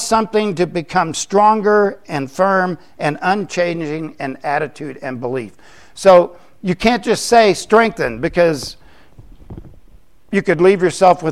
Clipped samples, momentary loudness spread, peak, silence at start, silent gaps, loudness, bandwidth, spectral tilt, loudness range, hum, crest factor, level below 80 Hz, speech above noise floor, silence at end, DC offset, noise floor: under 0.1%; 13 LU; 0 dBFS; 0 s; none; -16 LUFS; 14.5 kHz; -5 dB/octave; 5 LU; none; 16 dB; -46 dBFS; 33 dB; 0 s; 0.7%; -48 dBFS